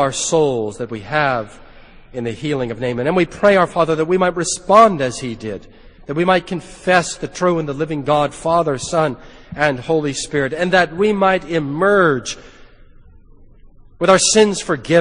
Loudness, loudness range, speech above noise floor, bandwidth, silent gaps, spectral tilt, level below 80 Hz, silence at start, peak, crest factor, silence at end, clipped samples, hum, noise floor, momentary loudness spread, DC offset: -17 LUFS; 3 LU; 27 dB; 10 kHz; none; -4 dB/octave; -44 dBFS; 0 s; 0 dBFS; 18 dB; 0 s; under 0.1%; none; -43 dBFS; 13 LU; under 0.1%